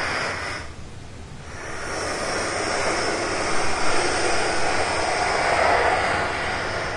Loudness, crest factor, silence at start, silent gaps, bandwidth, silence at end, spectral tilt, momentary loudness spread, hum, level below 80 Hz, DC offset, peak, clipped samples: -23 LUFS; 16 dB; 0 s; none; 11.5 kHz; 0 s; -3 dB/octave; 17 LU; none; -42 dBFS; under 0.1%; -6 dBFS; under 0.1%